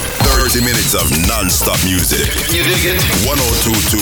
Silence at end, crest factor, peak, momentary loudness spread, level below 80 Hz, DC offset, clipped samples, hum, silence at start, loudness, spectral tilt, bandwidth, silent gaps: 0 s; 12 dB; 0 dBFS; 1 LU; -22 dBFS; 0.2%; under 0.1%; none; 0 s; -12 LUFS; -3 dB/octave; over 20 kHz; none